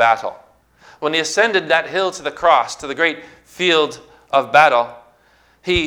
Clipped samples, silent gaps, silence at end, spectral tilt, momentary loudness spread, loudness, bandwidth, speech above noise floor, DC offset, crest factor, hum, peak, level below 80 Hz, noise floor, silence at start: under 0.1%; none; 0 s; -3 dB/octave; 13 LU; -17 LUFS; 17 kHz; 38 dB; under 0.1%; 18 dB; none; 0 dBFS; -46 dBFS; -55 dBFS; 0 s